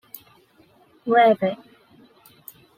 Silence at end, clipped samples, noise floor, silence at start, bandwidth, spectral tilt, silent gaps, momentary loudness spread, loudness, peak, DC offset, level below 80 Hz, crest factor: 1.25 s; under 0.1%; -57 dBFS; 1.05 s; 16 kHz; -6 dB/octave; none; 26 LU; -19 LUFS; -6 dBFS; under 0.1%; -72 dBFS; 18 dB